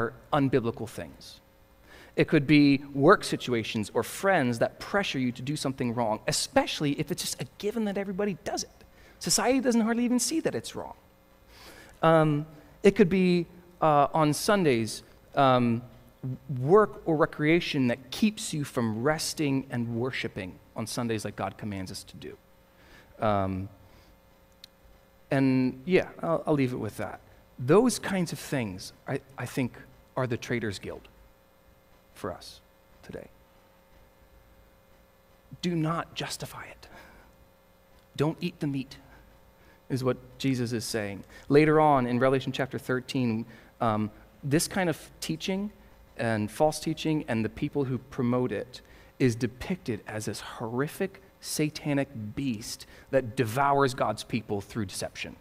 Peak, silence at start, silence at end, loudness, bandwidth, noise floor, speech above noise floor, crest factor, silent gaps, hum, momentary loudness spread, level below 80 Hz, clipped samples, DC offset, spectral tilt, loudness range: -6 dBFS; 0 s; 0.05 s; -28 LUFS; 16 kHz; -60 dBFS; 32 dB; 22 dB; none; none; 16 LU; -56 dBFS; under 0.1%; under 0.1%; -5 dB/octave; 11 LU